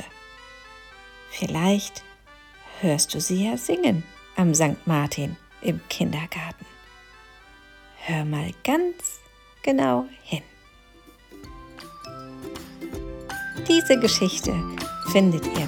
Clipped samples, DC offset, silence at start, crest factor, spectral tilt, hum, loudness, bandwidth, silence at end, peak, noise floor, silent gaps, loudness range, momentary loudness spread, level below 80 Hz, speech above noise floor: under 0.1%; under 0.1%; 0 s; 22 dB; -4.5 dB/octave; none; -24 LUFS; 19 kHz; 0 s; -4 dBFS; -52 dBFS; none; 7 LU; 24 LU; -50 dBFS; 29 dB